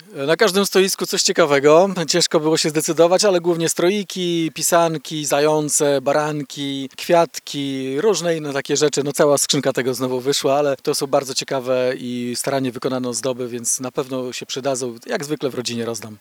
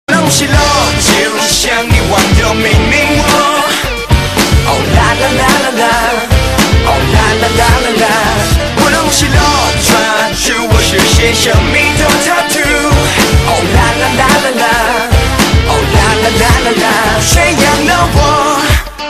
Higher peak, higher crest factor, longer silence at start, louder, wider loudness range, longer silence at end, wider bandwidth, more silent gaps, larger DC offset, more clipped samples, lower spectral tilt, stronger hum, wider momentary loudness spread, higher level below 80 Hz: about the same, 0 dBFS vs 0 dBFS; first, 18 dB vs 8 dB; about the same, 0.1 s vs 0.1 s; second, -19 LUFS vs -9 LUFS; first, 7 LU vs 1 LU; about the same, 0.05 s vs 0 s; first, over 20 kHz vs 14.5 kHz; neither; second, under 0.1% vs 0.7%; second, under 0.1% vs 0.3%; about the same, -3.5 dB/octave vs -3.5 dB/octave; neither; first, 10 LU vs 3 LU; second, -70 dBFS vs -18 dBFS